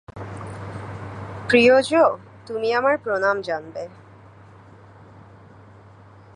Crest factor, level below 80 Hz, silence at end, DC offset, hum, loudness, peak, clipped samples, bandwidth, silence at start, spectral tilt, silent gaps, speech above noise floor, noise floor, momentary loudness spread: 20 dB; -54 dBFS; 1.15 s; under 0.1%; none; -19 LUFS; -2 dBFS; under 0.1%; 11 kHz; 0.1 s; -5.5 dB/octave; none; 28 dB; -47 dBFS; 20 LU